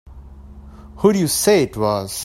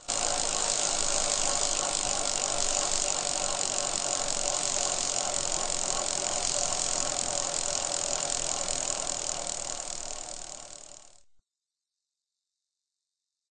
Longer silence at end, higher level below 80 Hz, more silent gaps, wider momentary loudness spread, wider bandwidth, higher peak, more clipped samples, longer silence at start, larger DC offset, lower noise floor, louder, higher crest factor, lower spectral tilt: second, 0 s vs 2.5 s; first, -42 dBFS vs -48 dBFS; neither; second, 6 LU vs 9 LU; first, 16.5 kHz vs 9.6 kHz; first, -2 dBFS vs -10 dBFS; neither; about the same, 0.05 s vs 0 s; second, under 0.1% vs 0.2%; second, -39 dBFS vs -89 dBFS; first, -17 LUFS vs -28 LUFS; about the same, 18 dB vs 22 dB; first, -4.5 dB/octave vs 0 dB/octave